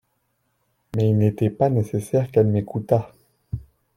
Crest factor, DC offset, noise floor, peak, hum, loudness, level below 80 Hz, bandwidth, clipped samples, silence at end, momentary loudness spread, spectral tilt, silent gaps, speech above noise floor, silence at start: 18 dB; under 0.1%; -71 dBFS; -4 dBFS; none; -21 LUFS; -52 dBFS; 13 kHz; under 0.1%; 0.35 s; 16 LU; -9 dB/octave; none; 51 dB; 0.95 s